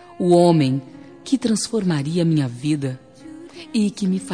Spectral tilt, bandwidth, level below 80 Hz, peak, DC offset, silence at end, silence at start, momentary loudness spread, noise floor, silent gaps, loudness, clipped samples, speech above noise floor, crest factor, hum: -6.5 dB/octave; 10 kHz; -62 dBFS; -4 dBFS; 0.1%; 0 s; 0.1 s; 22 LU; -40 dBFS; none; -20 LUFS; under 0.1%; 21 dB; 16 dB; none